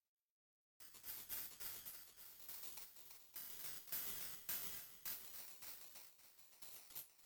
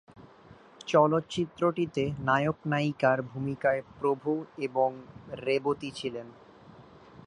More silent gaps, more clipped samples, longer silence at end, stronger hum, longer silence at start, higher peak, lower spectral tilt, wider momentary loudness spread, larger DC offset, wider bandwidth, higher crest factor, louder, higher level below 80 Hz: neither; neither; about the same, 0 s vs 0.1 s; neither; first, 0.8 s vs 0.15 s; second, -30 dBFS vs -10 dBFS; second, 0 dB/octave vs -6.5 dB/octave; about the same, 13 LU vs 11 LU; neither; first, 19.5 kHz vs 10.5 kHz; about the same, 22 dB vs 20 dB; second, -49 LUFS vs -29 LUFS; second, -82 dBFS vs -64 dBFS